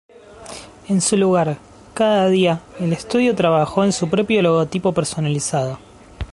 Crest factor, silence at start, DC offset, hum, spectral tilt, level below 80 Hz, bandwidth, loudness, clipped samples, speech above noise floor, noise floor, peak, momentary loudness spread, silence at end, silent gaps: 16 dB; 0.3 s; under 0.1%; none; -5 dB/octave; -46 dBFS; 11.5 kHz; -18 LUFS; under 0.1%; 20 dB; -37 dBFS; -2 dBFS; 19 LU; 0.05 s; none